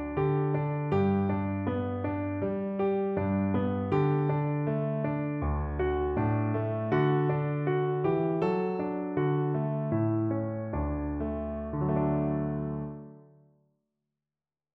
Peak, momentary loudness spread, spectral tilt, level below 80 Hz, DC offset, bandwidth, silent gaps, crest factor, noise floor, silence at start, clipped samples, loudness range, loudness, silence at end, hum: -14 dBFS; 6 LU; -8.5 dB/octave; -44 dBFS; under 0.1%; 4.3 kHz; none; 16 dB; under -90 dBFS; 0 s; under 0.1%; 4 LU; -30 LUFS; 1.55 s; none